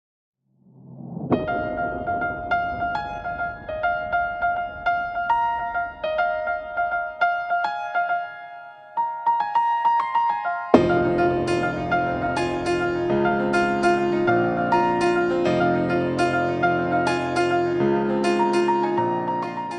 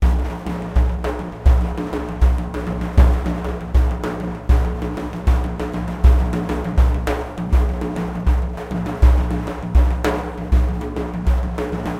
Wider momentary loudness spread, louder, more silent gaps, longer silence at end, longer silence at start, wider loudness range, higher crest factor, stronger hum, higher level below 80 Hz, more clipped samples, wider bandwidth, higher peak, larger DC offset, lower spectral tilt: about the same, 7 LU vs 9 LU; second, -23 LUFS vs -20 LUFS; neither; about the same, 0 s vs 0 s; first, 0.8 s vs 0 s; first, 5 LU vs 0 LU; about the same, 22 dB vs 18 dB; neither; second, -50 dBFS vs -18 dBFS; neither; first, 10 kHz vs 8 kHz; about the same, 0 dBFS vs 0 dBFS; neither; second, -6.5 dB/octave vs -8 dB/octave